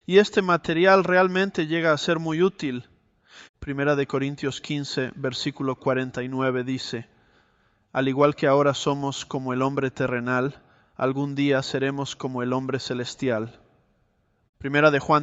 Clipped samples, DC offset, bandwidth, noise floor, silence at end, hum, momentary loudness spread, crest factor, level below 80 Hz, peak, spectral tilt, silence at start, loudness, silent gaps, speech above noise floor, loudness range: under 0.1%; under 0.1%; 8.2 kHz; -67 dBFS; 0 s; none; 11 LU; 20 dB; -58 dBFS; -4 dBFS; -5.5 dB/octave; 0.1 s; -24 LUFS; 3.49-3.54 s, 14.49-14.53 s; 44 dB; 5 LU